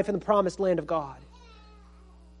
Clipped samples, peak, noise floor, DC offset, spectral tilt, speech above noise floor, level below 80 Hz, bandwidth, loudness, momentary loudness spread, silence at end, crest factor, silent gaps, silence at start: under 0.1%; -10 dBFS; -52 dBFS; under 0.1%; -6.5 dB/octave; 25 dB; -52 dBFS; 10.5 kHz; -27 LUFS; 16 LU; 1.15 s; 20 dB; none; 0 s